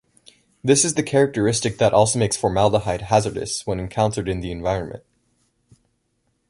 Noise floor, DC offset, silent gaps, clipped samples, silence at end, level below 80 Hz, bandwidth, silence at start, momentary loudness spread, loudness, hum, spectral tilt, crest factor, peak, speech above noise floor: -70 dBFS; under 0.1%; none; under 0.1%; 1.5 s; -44 dBFS; 11.5 kHz; 0.65 s; 9 LU; -20 LUFS; none; -4.5 dB/octave; 20 dB; -2 dBFS; 50 dB